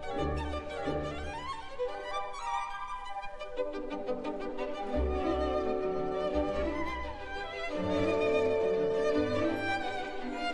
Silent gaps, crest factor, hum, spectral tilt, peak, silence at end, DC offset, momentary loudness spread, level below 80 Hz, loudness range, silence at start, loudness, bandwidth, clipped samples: none; 18 dB; none; -6 dB/octave; -16 dBFS; 0 s; under 0.1%; 10 LU; -46 dBFS; 6 LU; 0 s; -34 LUFS; 12 kHz; under 0.1%